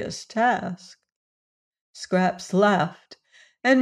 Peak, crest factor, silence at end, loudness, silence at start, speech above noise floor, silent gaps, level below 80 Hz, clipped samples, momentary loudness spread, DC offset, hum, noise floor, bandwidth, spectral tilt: -8 dBFS; 18 dB; 0 s; -23 LUFS; 0 s; over 66 dB; 1.12-1.71 s, 1.81-1.94 s; -66 dBFS; under 0.1%; 14 LU; under 0.1%; none; under -90 dBFS; 11 kHz; -5.5 dB/octave